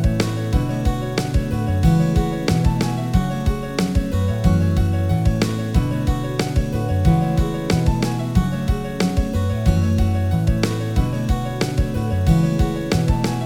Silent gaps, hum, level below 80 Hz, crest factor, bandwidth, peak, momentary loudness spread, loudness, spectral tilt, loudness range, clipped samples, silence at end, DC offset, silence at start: none; none; -24 dBFS; 16 dB; 16.5 kHz; -2 dBFS; 4 LU; -20 LUFS; -7 dB/octave; 1 LU; under 0.1%; 0 s; under 0.1%; 0 s